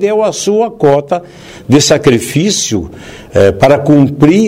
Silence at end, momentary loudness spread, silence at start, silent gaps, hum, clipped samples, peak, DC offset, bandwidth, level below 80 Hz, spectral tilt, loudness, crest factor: 0 s; 11 LU; 0 s; none; none; 0.7%; 0 dBFS; under 0.1%; 16.5 kHz; -38 dBFS; -5 dB/octave; -10 LUFS; 10 dB